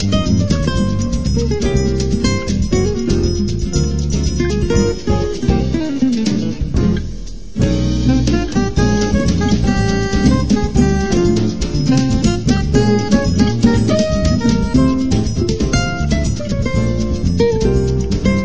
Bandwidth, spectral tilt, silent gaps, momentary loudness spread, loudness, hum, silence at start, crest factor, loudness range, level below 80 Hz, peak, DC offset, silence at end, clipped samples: 8 kHz; -6.5 dB/octave; none; 4 LU; -16 LUFS; none; 0 s; 14 dB; 3 LU; -22 dBFS; 0 dBFS; 4%; 0 s; under 0.1%